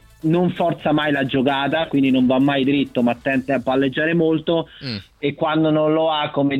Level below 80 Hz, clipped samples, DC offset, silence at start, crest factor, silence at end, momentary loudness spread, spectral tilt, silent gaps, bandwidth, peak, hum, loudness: -52 dBFS; under 0.1%; under 0.1%; 0.25 s; 14 dB; 0 s; 6 LU; -8 dB/octave; none; 7.6 kHz; -6 dBFS; none; -19 LUFS